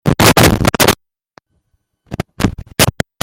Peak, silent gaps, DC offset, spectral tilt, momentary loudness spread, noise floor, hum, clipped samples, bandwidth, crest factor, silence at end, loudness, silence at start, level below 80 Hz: 0 dBFS; none; under 0.1%; -4 dB/octave; 18 LU; -64 dBFS; none; 0.1%; over 20 kHz; 14 dB; 0.35 s; -12 LUFS; 0.05 s; -30 dBFS